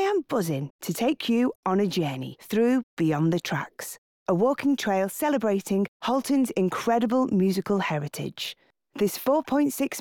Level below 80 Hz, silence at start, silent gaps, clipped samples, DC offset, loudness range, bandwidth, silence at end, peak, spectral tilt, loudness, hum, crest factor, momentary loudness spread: -66 dBFS; 0 s; 0.70-0.79 s, 1.55-1.63 s, 2.83-2.97 s, 3.98-4.26 s, 5.88-6.00 s; under 0.1%; under 0.1%; 1 LU; 19 kHz; 0 s; -12 dBFS; -5.5 dB/octave; -26 LUFS; none; 12 dB; 9 LU